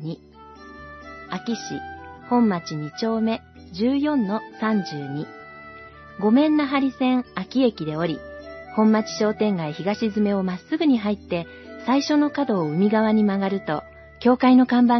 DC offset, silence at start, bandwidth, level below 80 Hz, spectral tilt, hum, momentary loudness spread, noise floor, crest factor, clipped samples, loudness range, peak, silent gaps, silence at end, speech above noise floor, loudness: under 0.1%; 0 s; 6.2 kHz; -58 dBFS; -6.5 dB/octave; none; 20 LU; -43 dBFS; 16 dB; under 0.1%; 4 LU; -6 dBFS; none; 0 s; 22 dB; -22 LUFS